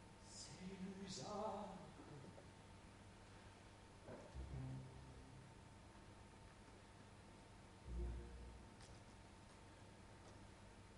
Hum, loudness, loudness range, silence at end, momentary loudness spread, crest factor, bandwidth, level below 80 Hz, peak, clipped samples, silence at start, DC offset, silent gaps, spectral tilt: none; -57 LUFS; 5 LU; 0 s; 12 LU; 20 dB; 11.5 kHz; -62 dBFS; -36 dBFS; under 0.1%; 0 s; under 0.1%; none; -5 dB/octave